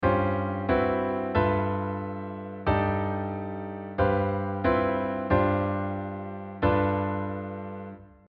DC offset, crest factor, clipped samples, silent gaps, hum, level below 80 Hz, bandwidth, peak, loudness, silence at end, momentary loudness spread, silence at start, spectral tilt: under 0.1%; 16 dB; under 0.1%; none; none; -46 dBFS; 5 kHz; -10 dBFS; -28 LUFS; 0.2 s; 11 LU; 0 s; -10.5 dB/octave